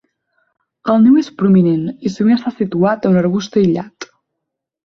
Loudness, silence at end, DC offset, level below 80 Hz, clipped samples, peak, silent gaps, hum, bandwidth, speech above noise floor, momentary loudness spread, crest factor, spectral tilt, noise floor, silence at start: -14 LUFS; 0.8 s; under 0.1%; -56 dBFS; under 0.1%; -2 dBFS; none; none; 7 kHz; 65 dB; 12 LU; 12 dB; -8 dB/octave; -78 dBFS; 0.85 s